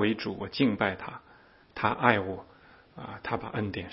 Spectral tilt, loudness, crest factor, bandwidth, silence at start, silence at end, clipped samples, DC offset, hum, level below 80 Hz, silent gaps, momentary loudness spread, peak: -9.5 dB/octave; -29 LUFS; 28 dB; 5.8 kHz; 0 s; 0 s; under 0.1%; under 0.1%; none; -60 dBFS; none; 18 LU; -4 dBFS